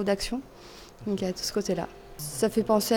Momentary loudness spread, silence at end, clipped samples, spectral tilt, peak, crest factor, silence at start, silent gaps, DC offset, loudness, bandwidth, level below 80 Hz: 18 LU; 0 s; under 0.1%; -4.5 dB/octave; -10 dBFS; 18 dB; 0 s; none; under 0.1%; -29 LUFS; 19.5 kHz; -50 dBFS